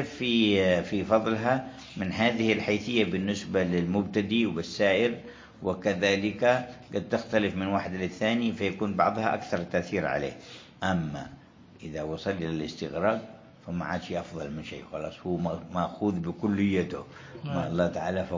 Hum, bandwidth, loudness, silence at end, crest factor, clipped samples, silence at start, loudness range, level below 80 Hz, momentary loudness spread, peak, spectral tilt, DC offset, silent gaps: none; 7.6 kHz; -28 LUFS; 0 s; 20 dB; under 0.1%; 0 s; 6 LU; -54 dBFS; 12 LU; -8 dBFS; -6 dB/octave; under 0.1%; none